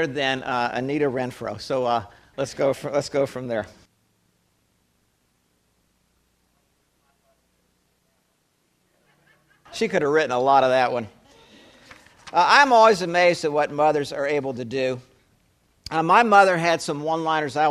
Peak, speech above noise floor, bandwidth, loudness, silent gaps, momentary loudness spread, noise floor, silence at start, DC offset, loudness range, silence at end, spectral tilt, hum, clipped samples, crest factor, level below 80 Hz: -2 dBFS; 48 dB; 14 kHz; -21 LUFS; none; 15 LU; -68 dBFS; 0 s; under 0.1%; 11 LU; 0 s; -4.5 dB/octave; none; under 0.1%; 22 dB; -62 dBFS